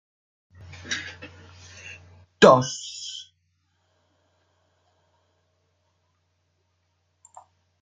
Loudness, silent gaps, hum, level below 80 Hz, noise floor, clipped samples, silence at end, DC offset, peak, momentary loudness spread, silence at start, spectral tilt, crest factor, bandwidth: -21 LUFS; none; none; -64 dBFS; -72 dBFS; under 0.1%; 4.6 s; under 0.1%; -2 dBFS; 30 LU; 0.9 s; -4 dB/octave; 28 dB; 9.6 kHz